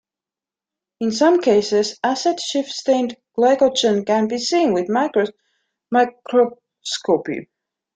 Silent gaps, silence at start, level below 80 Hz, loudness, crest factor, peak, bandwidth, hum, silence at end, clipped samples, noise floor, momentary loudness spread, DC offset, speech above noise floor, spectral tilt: none; 1 s; -64 dBFS; -19 LUFS; 16 dB; -4 dBFS; 9.4 kHz; none; 0.5 s; under 0.1%; -89 dBFS; 10 LU; under 0.1%; 71 dB; -4 dB/octave